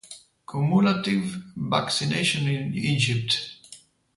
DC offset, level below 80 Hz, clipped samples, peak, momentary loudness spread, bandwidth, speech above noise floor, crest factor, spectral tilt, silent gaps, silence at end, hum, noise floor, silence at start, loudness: under 0.1%; -60 dBFS; under 0.1%; -6 dBFS; 15 LU; 11.5 kHz; 27 dB; 18 dB; -5 dB/octave; none; 0.4 s; none; -51 dBFS; 0.05 s; -24 LUFS